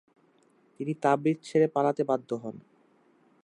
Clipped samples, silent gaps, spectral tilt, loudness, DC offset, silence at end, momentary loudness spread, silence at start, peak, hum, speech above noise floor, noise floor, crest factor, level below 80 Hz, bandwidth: under 0.1%; none; -7.5 dB/octave; -28 LUFS; under 0.1%; 0.85 s; 13 LU; 0.8 s; -10 dBFS; none; 37 dB; -65 dBFS; 20 dB; -80 dBFS; 10.5 kHz